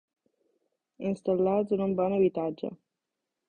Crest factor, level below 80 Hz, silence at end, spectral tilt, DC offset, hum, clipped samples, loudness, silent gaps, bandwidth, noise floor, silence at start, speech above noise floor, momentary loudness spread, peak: 16 dB; -66 dBFS; 0.75 s; -9.5 dB/octave; under 0.1%; none; under 0.1%; -28 LUFS; none; 9 kHz; -86 dBFS; 1 s; 59 dB; 11 LU; -14 dBFS